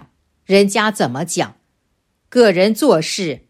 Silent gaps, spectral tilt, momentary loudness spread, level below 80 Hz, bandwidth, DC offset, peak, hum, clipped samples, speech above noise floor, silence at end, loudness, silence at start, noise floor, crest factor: none; -4.5 dB/octave; 8 LU; -60 dBFS; 15.5 kHz; under 0.1%; 0 dBFS; none; under 0.1%; 52 dB; 0.15 s; -15 LUFS; 0.5 s; -67 dBFS; 16 dB